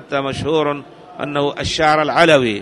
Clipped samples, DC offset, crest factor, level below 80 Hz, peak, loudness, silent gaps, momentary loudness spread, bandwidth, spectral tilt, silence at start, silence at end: under 0.1%; under 0.1%; 16 dB; -44 dBFS; 0 dBFS; -16 LUFS; none; 11 LU; 11.5 kHz; -4.5 dB/octave; 0 s; 0 s